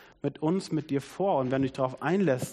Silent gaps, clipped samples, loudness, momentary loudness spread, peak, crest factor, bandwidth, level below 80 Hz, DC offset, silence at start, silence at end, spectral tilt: none; under 0.1%; -29 LUFS; 5 LU; -14 dBFS; 16 dB; 13 kHz; -62 dBFS; under 0.1%; 0.25 s; 0 s; -7 dB/octave